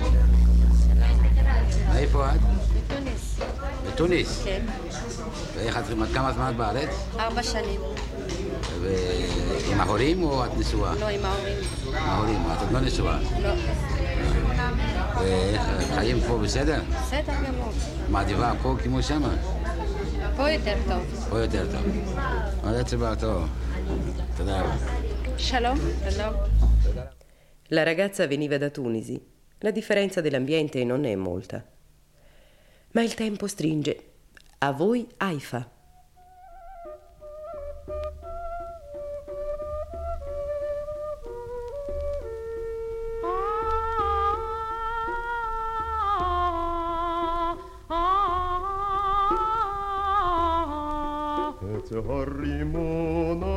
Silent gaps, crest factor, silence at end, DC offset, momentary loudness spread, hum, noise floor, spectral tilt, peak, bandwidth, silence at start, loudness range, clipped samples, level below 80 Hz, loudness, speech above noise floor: none; 18 dB; 0 s; under 0.1%; 11 LU; none; -57 dBFS; -6 dB/octave; -6 dBFS; 12 kHz; 0 s; 8 LU; under 0.1%; -28 dBFS; -27 LUFS; 32 dB